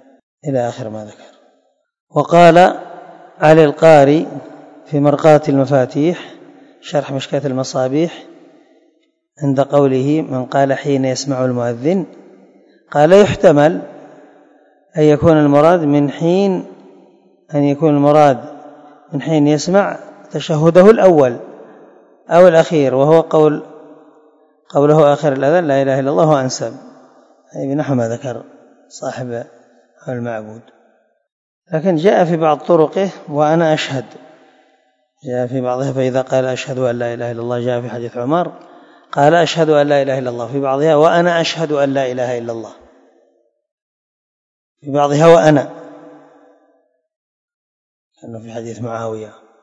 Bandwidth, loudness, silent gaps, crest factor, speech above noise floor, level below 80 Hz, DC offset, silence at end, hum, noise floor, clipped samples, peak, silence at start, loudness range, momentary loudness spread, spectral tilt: 9.8 kHz; -13 LUFS; 2.00-2.07 s, 31.32-31.62 s, 43.72-44.76 s, 47.16-47.48 s, 47.54-48.11 s; 14 dB; 47 dB; -54 dBFS; under 0.1%; 0.35 s; none; -60 dBFS; 0.5%; 0 dBFS; 0.45 s; 10 LU; 18 LU; -6.5 dB/octave